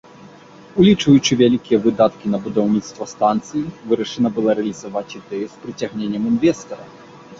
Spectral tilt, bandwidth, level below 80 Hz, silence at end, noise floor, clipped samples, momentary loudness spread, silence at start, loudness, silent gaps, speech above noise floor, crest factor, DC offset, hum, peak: -6 dB/octave; 7.8 kHz; -54 dBFS; 0.05 s; -42 dBFS; under 0.1%; 14 LU; 0.75 s; -18 LUFS; none; 25 dB; 16 dB; under 0.1%; none; -2 dBFS